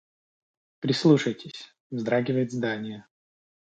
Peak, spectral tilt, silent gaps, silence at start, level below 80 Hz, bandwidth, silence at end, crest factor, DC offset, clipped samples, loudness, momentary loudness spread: -6 dBFS; -6.5 dB/octave; 1.80-1.90 s; 0.8 s; -72 dBFS; 9 kHz; 0.65 s; 22 dB; under 0.1%; under 0.1%; -25 LUFS; 19 LU